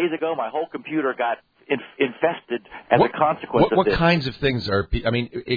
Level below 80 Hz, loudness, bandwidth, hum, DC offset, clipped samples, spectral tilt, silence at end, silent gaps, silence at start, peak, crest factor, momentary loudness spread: -40 dBFS; -22 LUFS; 5 kHz; none; under 0.1%; under 0.1%; -8 dB/octave; 0 s; none; 0 s; -2 dBFS; 20 dB; 9 LU